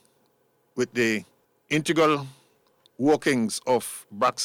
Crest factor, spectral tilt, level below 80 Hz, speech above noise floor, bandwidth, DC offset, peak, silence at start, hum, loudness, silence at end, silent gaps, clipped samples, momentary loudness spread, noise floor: 16 dB; -4 dB/octave; -68 dBFS; 43 dB; 17 kHz; under 0.1%; -10 dBFS; 0.75 s; none; -25 LUFS; 0 s; none; under 0.1%; 10 LU; -67 dBFS